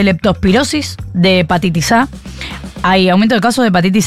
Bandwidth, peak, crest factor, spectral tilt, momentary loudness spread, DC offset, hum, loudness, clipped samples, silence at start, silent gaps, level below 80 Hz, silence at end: 14.5 kHz; -2 dBFS; 10 dB; -5 dB/octave; 12 LU; 0.7%; none; -12 LUFS; under 0.1%; 0 s; none; -34 dBFS; 0 s